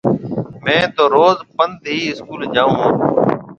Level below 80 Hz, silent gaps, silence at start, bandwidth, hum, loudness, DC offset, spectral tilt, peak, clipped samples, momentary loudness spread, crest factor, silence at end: -52 dBFS; none; 0.05 s; 7.6 kHz; none; -16 LUFS; under 0.1%; -6 dB/octave; 0 dBFS; under 0.1%; 9 LU; 16 dB; 0.05 s